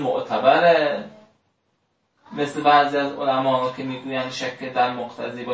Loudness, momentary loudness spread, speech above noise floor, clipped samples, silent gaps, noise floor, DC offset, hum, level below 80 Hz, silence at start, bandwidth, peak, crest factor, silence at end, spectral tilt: -21 LUFS; 15 LU; 49 dB; under 0.1%; none; -70 dBFS; under 0.1%; none; -68 dBFS; 0 s; 8 kHz; -4 dBFS; 18 dB; 0 s; -5 dB/octave